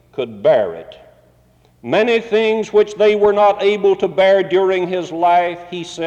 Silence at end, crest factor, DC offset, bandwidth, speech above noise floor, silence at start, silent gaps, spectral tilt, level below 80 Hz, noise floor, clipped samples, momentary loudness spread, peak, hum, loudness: 0 s; 12 dB; under 0.1%; 8.6 kHz; 38 dB; 0.15 s; none; -5.5 dB/octave; -56 dBFS; -53 dBFS; under 0.1%; 12 LU; -4 dBFS; none; -15 LUFS